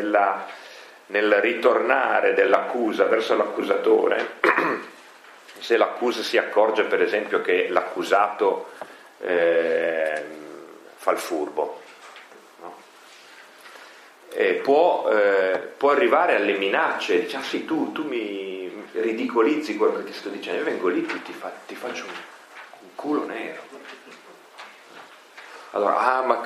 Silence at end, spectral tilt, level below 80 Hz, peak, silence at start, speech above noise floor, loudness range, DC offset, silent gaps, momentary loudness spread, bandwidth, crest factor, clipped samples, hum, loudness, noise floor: 0 s; -4 dB/octave; -84 dBFS; -2 dBFS; 0 s; 26 dB; 11 LU; under 0.1%; none; 22 LU; 13.5 kHz; 22 dB; under 0.1%; none; -22 LUFS; -48 dBFS